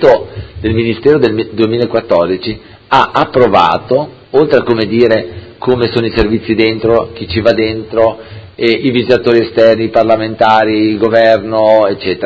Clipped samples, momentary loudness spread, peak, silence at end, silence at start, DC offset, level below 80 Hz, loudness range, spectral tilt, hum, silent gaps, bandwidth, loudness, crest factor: 0.5%; 7 LU; 0 dBFS; 0 s; 0 s; under 0.1%; -36 dBFS; 3 LU; -7.5 dB/octave; none; none; 8 kHz; -11 LUFS; 10 dB